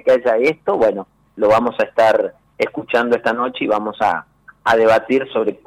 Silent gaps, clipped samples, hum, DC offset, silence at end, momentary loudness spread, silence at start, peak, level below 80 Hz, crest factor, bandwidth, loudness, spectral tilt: none; under 0.1%; none; under 0.1%; 0.1 s; 9 LU; 0.05 s; -6 dBFS; -54 dBFS; 10 dB; 12 kHz; -17 LUFS; -5.5 dB/octave